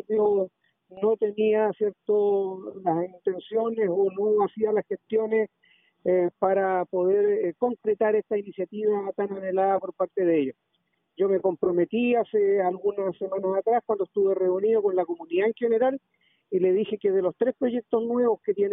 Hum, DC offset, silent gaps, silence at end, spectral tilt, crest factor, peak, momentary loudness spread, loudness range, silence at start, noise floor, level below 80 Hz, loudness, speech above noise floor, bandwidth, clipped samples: none; under 0.1%; none; 0 s; -3 dB/octave; 14 dB; -10 dBFS; 6 LU; 1 LU; 0.1 s; -74 dBFS; -72 dBFS; -25 LUFS; 50 dB; 3.8 kHz; under 0.1%